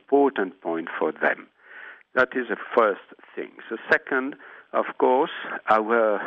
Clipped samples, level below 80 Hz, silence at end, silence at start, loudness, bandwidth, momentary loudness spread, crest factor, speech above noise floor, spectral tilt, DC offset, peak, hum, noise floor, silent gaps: under 0.1%; -74 dBFS; 0 s; 0.1 s; -24 LUFS; 6.6 kHz; 16 LU; 18 dB; 21 dB; -6.5 dB/octave; under 0.1%; -6 dBFS; none; -45 dBFS; none